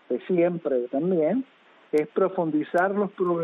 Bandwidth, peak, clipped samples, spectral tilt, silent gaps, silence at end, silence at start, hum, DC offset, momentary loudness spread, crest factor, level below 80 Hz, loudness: 9.6 kHz; -10 dBFS; under 0.1%; -8.5 dB/octave; none; 0 s; 0.1 s; none; under 0.1%; 4 LU; 14 dB; -72 dBFS; -25 LUFS